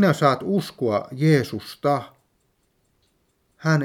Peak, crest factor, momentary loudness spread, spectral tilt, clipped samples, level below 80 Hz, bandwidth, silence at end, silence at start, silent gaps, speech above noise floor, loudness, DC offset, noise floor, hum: -2 dBFS; 20 dB; 9 LU; -7 dB/octave; under 0.1%; -66 dBFS; 15.5 kHz; 0 s; 0 s; none; 47 dB; -22 LUFS; under 0.1%; -68 dBFS; none